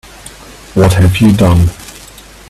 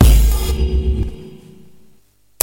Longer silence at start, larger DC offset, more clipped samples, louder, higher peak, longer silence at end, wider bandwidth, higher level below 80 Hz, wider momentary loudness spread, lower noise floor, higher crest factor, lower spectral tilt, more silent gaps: first, 0.75 s vs 0 s; neither; neither; first, -10 LUFS vs -18 LUFS; about the same, 0 dBFS vs 0 dBFS; second, 0.5 s vs 1.05 s; second, 14 kHz vs 17 kHz; second, -28 dBFS vs -16 dBFS; about the same, 23 LU vs 21 LU; second, -35 dBFS vs -50 dBFS; about the same, 12 dB vs 16 dB; about the same, -6.5 dB/octave vs -5.5 dB/octave; neither